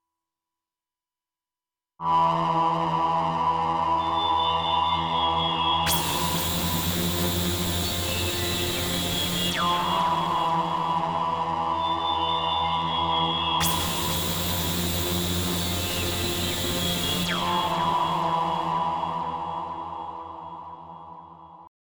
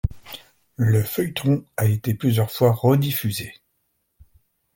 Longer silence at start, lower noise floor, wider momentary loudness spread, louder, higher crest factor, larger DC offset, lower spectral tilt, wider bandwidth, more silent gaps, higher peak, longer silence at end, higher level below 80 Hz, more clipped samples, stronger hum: first, 2 s vs 0.05 s; first, under -90 dBFS vs -72 dBFS; second, 8 LU vs 17 LU; second, -24 LUFS vs -21 LUFS; about the same, 14 dB vs 18 dB; neither; second, -3.5 dB/octave vs -6.5 dB/octave; first, over 20 kHz vs 17 kHz; neither; second, -12 dBFS vs -4 dBFS; second, 0.3 s vs 1.25 s; second, -50 dBFS vs -42 dBFS; neither; neither